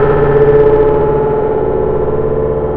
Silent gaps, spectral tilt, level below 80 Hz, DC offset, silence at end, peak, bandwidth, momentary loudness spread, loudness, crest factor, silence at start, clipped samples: none; -11.5 dB/octave; -24 dBFS; 6%; 0 s; 0 dBFS; 3.8 kHz; 6 LU; -11 LUFS; 10 dB; 0 s; under 0.1%